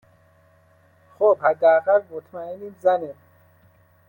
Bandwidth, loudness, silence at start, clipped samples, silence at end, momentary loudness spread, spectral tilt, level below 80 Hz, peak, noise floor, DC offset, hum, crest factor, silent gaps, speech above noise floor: 16.5 kHz; -20 LUFS; 1.2 s; under 0.1%; 0.95 s; 18 LU; -7 dB/octave; -74 dBFS; -6 dBFS; -57 dBFS; under 0.1%; none; 18 dB; none; 37 dB